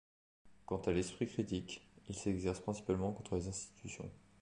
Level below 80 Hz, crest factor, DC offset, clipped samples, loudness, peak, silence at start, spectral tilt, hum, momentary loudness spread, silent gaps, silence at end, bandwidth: -58 dBFS; 18 dB; under 0.1%; under 0.1%; -41 LUFS; -22 dBFS; 0.45 s; -5.5 dB/octave; none; 12 LU; none; 0.25 s; 11 kHz